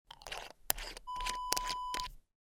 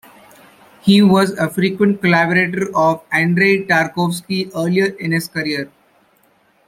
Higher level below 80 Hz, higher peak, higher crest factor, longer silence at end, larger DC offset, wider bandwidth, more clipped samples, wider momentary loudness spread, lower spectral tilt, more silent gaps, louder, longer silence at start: first, -52 dBFS vs -58 dBFS; second, -6 dBFS vs 0 dBFS; first, 34 dB vs 16 dB; second, 0.3 s vs 1 s; neither; first, 19.5 kHz vs 16 kHz; neither; about the same, 11 LU vs 9 LU; second, 0 dB/octave vs -6 dB/octave; neither; second, -38 LUFS vs -16 LUFS; second, 0.1 s vs 0.85 s